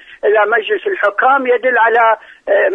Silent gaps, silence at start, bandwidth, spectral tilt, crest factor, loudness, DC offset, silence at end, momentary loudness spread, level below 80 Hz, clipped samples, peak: none; 0.1 s; 3.9 kHz; -4 dB/octave; 12 dB; -13 LUFS; under 0.1%; 0 s; 5 LU; -64 dBFS; under 0.1%; -2 dBFS